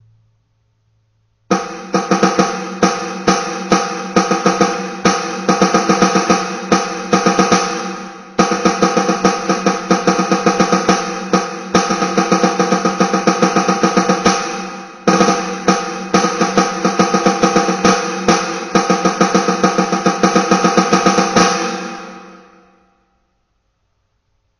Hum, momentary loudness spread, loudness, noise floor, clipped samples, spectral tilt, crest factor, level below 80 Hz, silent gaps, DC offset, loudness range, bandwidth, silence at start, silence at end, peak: none; 6 LU; -15 LUFS; -65 dBFS; under 0.1%; -4.5 dB/octave; 16 dB; -50 dBFS; none; under 0.1%; 3 LU; 11 kHz; 1.5 s; 2.25 s; 0 dBFS